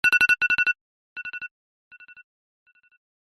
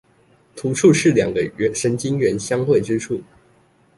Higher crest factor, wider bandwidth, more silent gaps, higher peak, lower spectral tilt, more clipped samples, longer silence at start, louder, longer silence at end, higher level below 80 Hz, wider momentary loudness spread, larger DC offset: about the same, 22 dB vs 18 dB; about the same, 12.5 kHz vs 11.5 kHz; first, 0.81-1.16 s vs none; about the same, -4 dBFS vs -2 dBFS; second, -0.5 dB/octave vs -5.5 dB/octave; neither; second, 0.05 s vs 0.55 s; about the same, -21 LUFS vs -19 LUFS; first, 1.85 s vs 0.75 s; second, -64 dBFS vs -52 dBFS; first, 21 LU vs 11 LU; neither